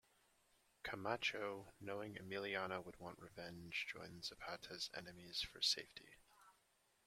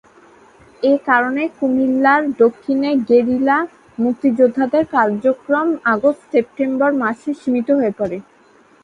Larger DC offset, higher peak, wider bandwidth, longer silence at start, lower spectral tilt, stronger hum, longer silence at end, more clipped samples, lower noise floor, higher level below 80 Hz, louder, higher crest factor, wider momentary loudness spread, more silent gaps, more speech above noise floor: neither; second, -24 dBFS vs 0 dBFS; first, 16.5 kHz vs 7.6 kHz; about the same, 0.85 s vs 0.8 s; second, -2.5 dB/octave vs -7 dB/octave; neither; about the same, 0.55 s vs 0.6 s; neither; first, -79 dBFS vs -50 dBFS; second, -76 dBFS vs -58 dBFS; second, -46 LUFS vs -17 LUFS; first, 24 dB vs 16 dB; first, 15 LU vs 7 LU; neither; about the same, 32 dB vs 34 dB